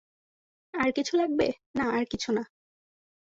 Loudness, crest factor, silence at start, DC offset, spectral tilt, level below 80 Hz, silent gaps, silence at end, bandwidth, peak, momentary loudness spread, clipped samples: -28 LUFS; 18 dB; 0.75 s; under 0.1%; -4.5 dB/octave; -60 dBFS; 1.66-1.74 s; 0.8 s; 8 kHz; -12 dBFS; 6 LU; under 0.1%